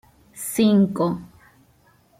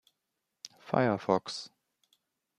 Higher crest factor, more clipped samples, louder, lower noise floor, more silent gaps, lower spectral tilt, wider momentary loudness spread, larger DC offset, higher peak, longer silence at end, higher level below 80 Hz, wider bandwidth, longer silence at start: second, 16 dB vs 24 dB; neither; first, -21 LUFS vs -31 LUFS; second, -58 dBFS vs -85 dBFS; neither; about the same, -6 dB/octave vs -5.5 dB/octave; second, 15 LU vs 21 LU; neither; about the same, -8 dBFS vs -10 dBFS; about the same, 0.95 s vs 0.9 s; first, -60 dBFS vs -76 dBFS; first, 16 kHz vs 13 kHz; second, 0.35 s vs 0.65 s